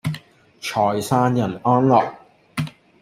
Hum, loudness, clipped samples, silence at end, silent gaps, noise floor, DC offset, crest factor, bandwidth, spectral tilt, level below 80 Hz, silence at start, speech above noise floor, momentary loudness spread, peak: none; -20 LUFS; under 0.1%; 0.3 s; none; -42 dBFS; under 0.1%; 18 dB; 15.5 kHz; -6.5 dB/octave; -56 dBFS; 0.05 s; 25 dB; 15 LU; -4 dBFS